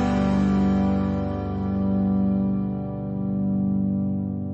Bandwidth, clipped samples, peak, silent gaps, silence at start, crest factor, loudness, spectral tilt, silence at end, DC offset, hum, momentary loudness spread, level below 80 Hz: 7.4 kHz; under 0.1%; -12 dBFS; none; 0 s; 12 dB; -24 LUFS; -9.5 dB/octave; 0 s; under 0.1%; none; 7 LU; -38 dBFS